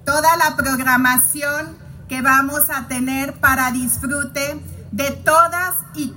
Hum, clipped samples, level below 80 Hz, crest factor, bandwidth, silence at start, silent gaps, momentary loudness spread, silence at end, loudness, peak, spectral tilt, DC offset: none; under 0.1%; -44 dBFS; 18 dB; 17 kHz; 0.05 s; none; 11 LU; 0 s; -17 LUFS; 0 dBFS; -3 dB/octave; under 0.1%